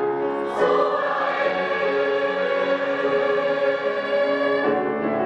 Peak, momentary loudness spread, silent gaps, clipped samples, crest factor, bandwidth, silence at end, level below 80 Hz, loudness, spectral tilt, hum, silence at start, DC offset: -8 dBFS; 3 LU; none; under 0.1%; 14 dB; 8.2 kHz; 0 s; -66 dBFS; -22 LUFS; -5.5 dB/octave; none; 0 s; under 0.1%